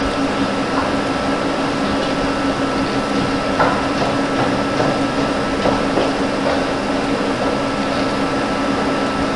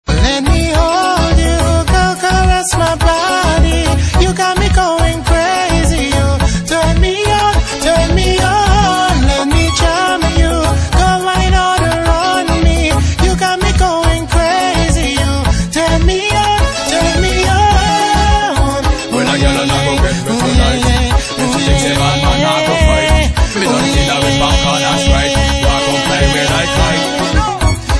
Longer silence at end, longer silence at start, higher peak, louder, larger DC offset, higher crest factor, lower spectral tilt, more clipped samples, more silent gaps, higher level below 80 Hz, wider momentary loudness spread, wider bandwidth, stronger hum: about the same, 0 s vs 0 s; about the same, 0 s vs 0.05 s; about the same, 0 dBFS vs 0 dBFS; second, -18 LUFS vs -12 LUFS; first, 0.5% vs under 0.1%; first, 18 dB vs 12 dB; about the same, -5 dB/octave vs -4.5 dB/octave; neither; neither; second, -38 dBFS vs -16 dBFS; about the same, 2 LU vs 3 LU; about the same, 11.5 kHz vs 11 kHz; neither